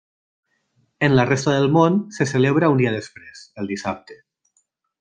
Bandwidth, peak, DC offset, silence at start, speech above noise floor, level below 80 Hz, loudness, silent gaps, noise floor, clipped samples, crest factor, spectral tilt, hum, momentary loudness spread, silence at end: 9.6 kHz; -2 dBFS; under 0.1%; 1 s; 49 dB; -56 dBFS; -19 LUFS; none; -68 dBFS; under 0.1%; 18 dB; -6.5 dB/octave; none; 17 LU; 0.85 s